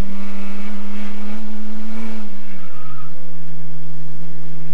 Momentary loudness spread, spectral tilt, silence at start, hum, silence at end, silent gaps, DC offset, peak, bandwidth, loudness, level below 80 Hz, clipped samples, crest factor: 8 LU; -7 dB/octave; 0 s; none; 0 s; none; 50%; -4 dBFS; 11.5 kHz; -34 LUFS; -60 dBFS; under 0.1%; 12 dB